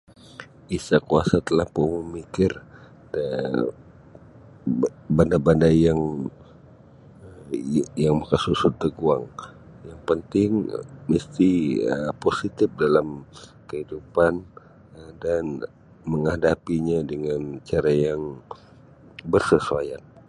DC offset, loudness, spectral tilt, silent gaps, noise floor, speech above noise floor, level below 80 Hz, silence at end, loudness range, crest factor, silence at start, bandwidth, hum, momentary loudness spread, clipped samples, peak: under 0.1%; -23 LUFS; -7 dB/octave; none; -49 dBFS; 27 dB; -46 dBFS; 0.3 s; 4 LU; 22 dB; 0.4 s; 11.5 kHz; none; 18 LU; under 0.1%; -2 dBFS